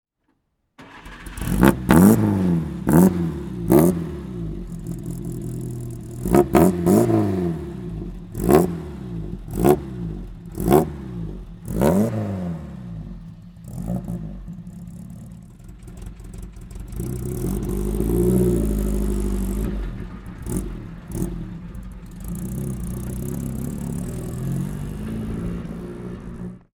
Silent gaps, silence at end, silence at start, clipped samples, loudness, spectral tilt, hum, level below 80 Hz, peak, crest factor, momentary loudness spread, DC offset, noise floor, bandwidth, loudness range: none; 0.2 s; 0.8 s; under 0.1%; -22 LUFS; -7.5 dB/octave; none; -34 dBFS; 0 dBFS; 22 dB; 21 LU; under 0.1%; -70 dBFS; 20 kHz; 14 LU